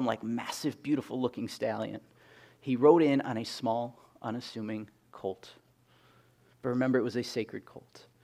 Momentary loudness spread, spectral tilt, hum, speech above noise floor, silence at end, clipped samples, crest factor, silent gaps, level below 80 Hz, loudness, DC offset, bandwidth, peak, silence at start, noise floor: 18 LU; -6 dB/octave; none; 33 dB; 0.25 s; under 0.1%; 24 dB; none; -76 dBFS; -31 LUFS; under 0.1%; 15 kHz; -8 dBFS; 0 s; -64 dBFS